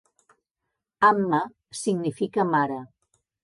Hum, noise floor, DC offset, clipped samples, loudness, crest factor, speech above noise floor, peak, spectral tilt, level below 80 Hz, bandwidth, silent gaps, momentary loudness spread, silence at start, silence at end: none; -83 dBFS; under 0.1%; under 0.1%; -24 LUFS; 20 dB; 60 dB; -6 dBFS; -5.5 dB/octave; -72 dBFS; 11.5 kHz; none; 11 LU; 1 s; 0.55 s